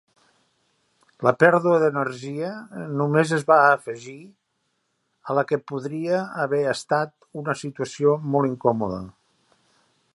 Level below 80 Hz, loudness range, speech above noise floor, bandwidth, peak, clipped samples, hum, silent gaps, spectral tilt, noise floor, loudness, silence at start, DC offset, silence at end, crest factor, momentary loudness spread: -62 dBFS; 6 LU; 51 dB; 11.5 kHz; -2 dBFS; under 0.1%; none; none; -6.5 dB/octave; -73 dBFS; -22 LUFS; 1.2 s; under 0.1%; 1.05 s; 22 dB; 15 LU